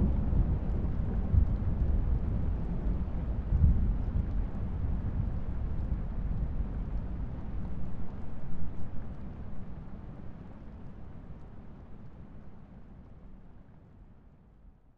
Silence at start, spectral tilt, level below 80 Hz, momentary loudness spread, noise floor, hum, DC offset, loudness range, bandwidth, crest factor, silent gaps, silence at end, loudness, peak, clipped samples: 0 s; -11 dB/octave; -34 dBFS; 21 LU; -56 dBFS; none; under 0.1%; 19 LU; 3.6 kHz; 20 dB; none; 0.25 s; -34 LUFS; -10 dBFS; under 0.1%